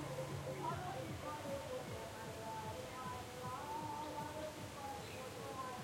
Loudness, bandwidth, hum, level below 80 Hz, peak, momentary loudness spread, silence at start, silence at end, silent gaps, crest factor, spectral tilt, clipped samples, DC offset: -46 LUFS; 16.5 kHz; none; -68 dBFS; -32 dBFS; 4 LU; 0 s; 0 s; none; 14 dB; -4.5 dB/octave; under 0.1%; under 0.1%